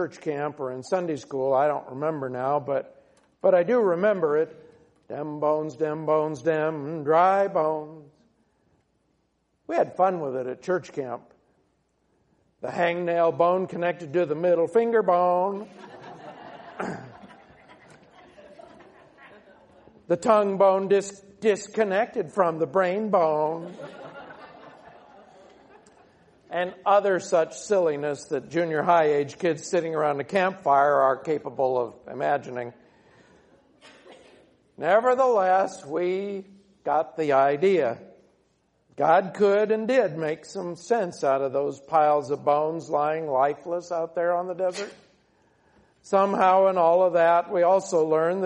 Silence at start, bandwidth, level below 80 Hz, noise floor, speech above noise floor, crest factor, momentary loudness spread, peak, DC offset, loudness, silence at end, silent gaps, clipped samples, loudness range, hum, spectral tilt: 0 s; 10 kHz; -72 dBFS; -71 dBFS; 48 dB; 18 dB; 14 LU; -6 dBFS; under 0.1%; -24 LUFS; 0 s; none; under 0.1%; 7 LU; none; -6 dB/octave